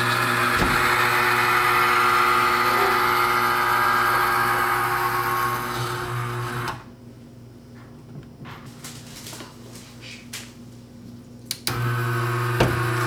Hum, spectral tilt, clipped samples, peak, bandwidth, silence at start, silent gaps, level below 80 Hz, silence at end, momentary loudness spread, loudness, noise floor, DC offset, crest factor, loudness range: 60 Hz at -45 dBFS; -4 dB/octave; under 0.1%; -4 dBFS; over 20 kHz; 0 s; none; -46 dBFS; 0 s; 22 LU; -20 LUFS; -43 dBFS; under 0.1%; 18 dB; 20 LU